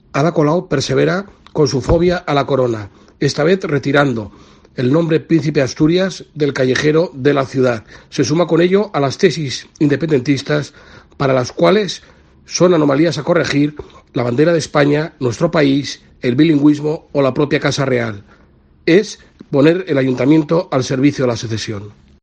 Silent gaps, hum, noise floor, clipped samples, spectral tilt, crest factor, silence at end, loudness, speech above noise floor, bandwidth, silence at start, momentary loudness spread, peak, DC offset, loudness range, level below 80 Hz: none; none; -49 dBFS; under 0.1%; -6 dB/octave; 16 dB; 0.3 s; -15 LUFS; 34 dB; 9.4 kHz; 0.15 s; 10 LU; 0 dBFS; under 0.1%; 1 LU; -40 dBFS